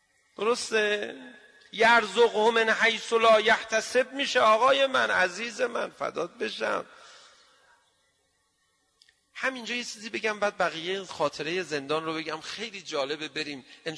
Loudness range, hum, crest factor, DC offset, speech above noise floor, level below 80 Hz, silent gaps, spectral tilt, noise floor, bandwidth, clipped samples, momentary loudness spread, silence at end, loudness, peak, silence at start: 14 LU; none; 18 dB; under 0.1%; 45 dB; -72 dBFS; none; -2.5 dB/octave; -72 dBFS; 11 kHz; under 0.1%; 13 LU; 0 s; -26 LUFS; -10 dBFS; 0.4 s